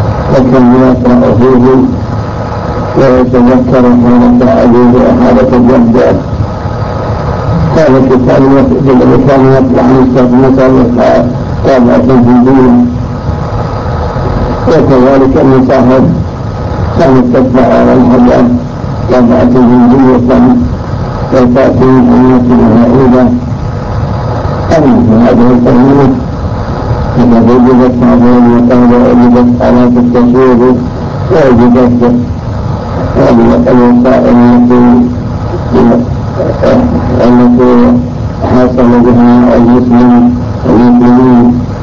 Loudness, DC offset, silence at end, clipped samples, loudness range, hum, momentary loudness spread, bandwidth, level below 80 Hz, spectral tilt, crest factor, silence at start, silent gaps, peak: -6 LUFS; under 0.1%; 0 s; 4%; 2 LU; none; 10 LU; 7 kHz; -22 dBFS; -9 dB/octave; 4 dB; 0 s; none; 0 dBFS